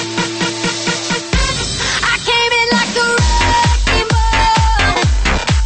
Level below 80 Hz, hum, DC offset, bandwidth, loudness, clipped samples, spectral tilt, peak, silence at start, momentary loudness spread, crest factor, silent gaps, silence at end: -20 dBFS; none; under 0.1%; 8.8 kHz; -13 LUFS; under 0.1%; -3.5 dB/octave; -2 dBFS; 0 s; 5 LU; 12 dB; none; 0 s